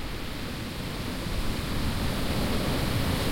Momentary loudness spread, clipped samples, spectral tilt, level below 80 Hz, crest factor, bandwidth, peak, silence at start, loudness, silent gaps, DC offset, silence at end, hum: 7 LU; under 0.1%; -5 dB/octave; -36 dBFS; 14 dB; 16.5 kHz; -14 dBFS; 0 s; -30 LUFS; none; under 0.1%; 0 s; none